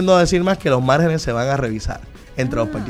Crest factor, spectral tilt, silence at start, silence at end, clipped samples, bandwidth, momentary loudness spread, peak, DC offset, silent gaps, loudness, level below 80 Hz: 16 dB; -6 dB/octave; 0 s; 0 s; under 0.1%; 14 kHz; 14 LU; -2 dBFS; under 0.1%; none; -18 LUFS; -34 dBFS